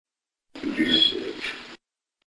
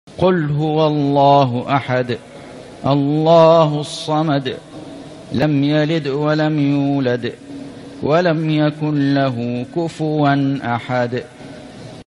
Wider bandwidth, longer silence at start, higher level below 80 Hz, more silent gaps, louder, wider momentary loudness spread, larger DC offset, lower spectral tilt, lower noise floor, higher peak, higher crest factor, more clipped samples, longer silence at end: about the same, 11 kHz vs 11 kHz; first, 0.55 s vs 0.05 s; second, -60 dBFS vs -54 dBFS; neither; second, -23 LUFS vs -17 LUFS; second, 16 LU vs 22 LU; neither; second, -3.5 dB/octave vs -7.5 dB/octave; first, -73 dBFS vs -35 dBFS; second, -6 dBFS vs 0 dBFS; about the same, 20 dB vs 16 dB; neither; first, 0.5 s vs 0.2 s